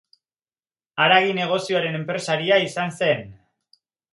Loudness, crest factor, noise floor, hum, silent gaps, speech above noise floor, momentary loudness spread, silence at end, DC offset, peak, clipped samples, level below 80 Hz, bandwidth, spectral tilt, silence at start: -21 LUFS; 22 dB; under -90 dBFS; none; none; over 69 dB; 10 LU; 0.8 s; under 0.1%; -2 dBFS; under 0.1%; -66 dBFS; 11.5 kHz; -4.5 dB/octave; 0.95 s